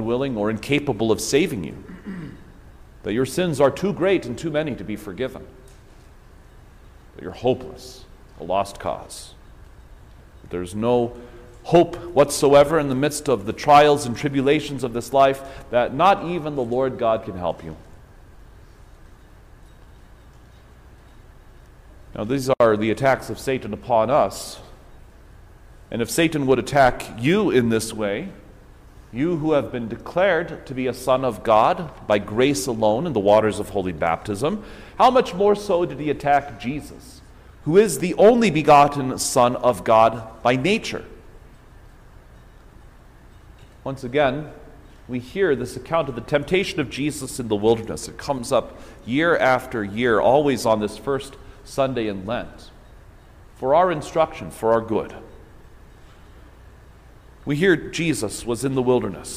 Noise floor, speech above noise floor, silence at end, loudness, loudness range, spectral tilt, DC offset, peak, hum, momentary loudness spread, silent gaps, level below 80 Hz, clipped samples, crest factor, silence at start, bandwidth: -47 dBFS; 26 dB; 0 s; -21 LUFS; 11 LU; -5 dB/octave; under 0.1%; -2 dBFS; none; 16 LU; none; -46 dBFS; under 0.1%; 20 dB; 0 s; 16 kHz